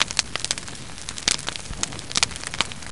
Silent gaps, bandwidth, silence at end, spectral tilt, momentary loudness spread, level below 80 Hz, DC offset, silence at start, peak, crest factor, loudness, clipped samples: none; 11.5 kHz; 0 s; -0.5 dB/octave; 10 LU; -44 dBFS; 1%; 0 s; -2 dBFS; 26 dB; -25 LUFS; under 0.1%